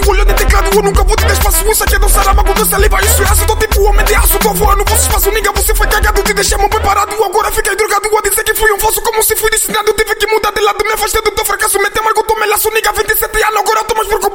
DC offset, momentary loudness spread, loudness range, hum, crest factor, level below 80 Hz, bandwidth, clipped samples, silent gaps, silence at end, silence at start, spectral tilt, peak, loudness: under 0.1%; 3 LU; 2 LU; none; 10 dB; -16 dBFS; 17 kHz; under 0.1%; none; 0 s; 0 s; -3 dB/octave; 0 dBFS; -11 LUFS